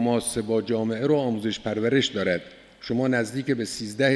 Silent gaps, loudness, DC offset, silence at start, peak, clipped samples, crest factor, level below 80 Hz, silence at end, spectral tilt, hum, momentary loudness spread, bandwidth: none; -25 LUFS; under 0.1%; 0 s; -6 dBFS; under 0.1%; 18 dB; -58 dBFS; 0 s; -5 dB/octave; none; 6 LU; 11 kHz